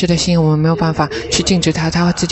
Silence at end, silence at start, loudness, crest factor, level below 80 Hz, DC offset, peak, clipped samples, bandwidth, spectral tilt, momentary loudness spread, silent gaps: 0 s; 0 s; -14 LUFS; 12 dB; -34 dBFS; under 0.1%; -2 dBFS; under 0.1%; 8.4 kHz; -5 dB/octave; 3 LU; none